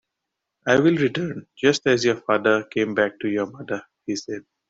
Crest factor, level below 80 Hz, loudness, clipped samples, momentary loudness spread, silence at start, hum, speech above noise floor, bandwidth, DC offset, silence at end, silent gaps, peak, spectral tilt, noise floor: 20 dB; -62 dBFS; -22 LUFS; under 0.1%; 12 LU; 0.65 s; none; 60 dB; 7.8 kHz; under 0.1%; 0.3 s; none; -4 dBFS; -5 dB/octave; -82 dBFS